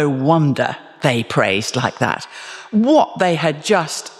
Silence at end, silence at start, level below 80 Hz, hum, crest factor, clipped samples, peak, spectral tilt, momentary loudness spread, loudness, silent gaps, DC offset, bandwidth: 0.05 s; 0 s; -62 dBFS; none; 16 dB; under 0.1%; -2 dBFS; -5 dB/octave; 8 LU; -17 LUFS; none; under 0.1%; 13.5 kHz